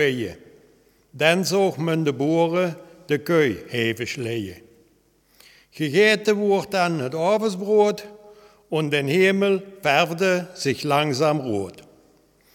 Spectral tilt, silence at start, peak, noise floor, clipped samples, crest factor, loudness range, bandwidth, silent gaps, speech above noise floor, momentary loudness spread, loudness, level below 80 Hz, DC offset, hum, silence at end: -5 dB/octave; 0 s; -2 dBFS; -61 dBFS; under 0.1%; 20 dB; 3 LU; 17.5 kHz; none; 40 dB; 10 LU; -21 LUFS; -64 dBFS; under 0.1%; none; 0.75 s